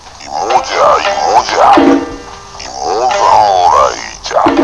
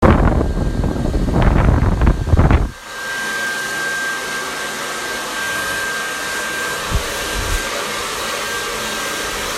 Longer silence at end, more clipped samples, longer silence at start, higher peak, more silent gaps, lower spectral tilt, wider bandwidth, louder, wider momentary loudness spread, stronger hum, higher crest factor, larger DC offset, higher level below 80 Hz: about the same, 0 s vs 0 s; first, 0.9% vs under 0.1%; about the same, 0.05 s vs 0 s; about the same, 0 dBFS vs 0 dBFS; neither; about the same, -3.5 dB/octave vs -4.5 dB/octave; second, 11 kHz vs 16 kHz; first, -10 LUFS vs -19 LUFS; first, 16 LU vs 7 LU; neither; second, 10 dB vs 18 dB; first, 0.4% vs under 0.1%; second, -38 dBFS vs -22 dBFS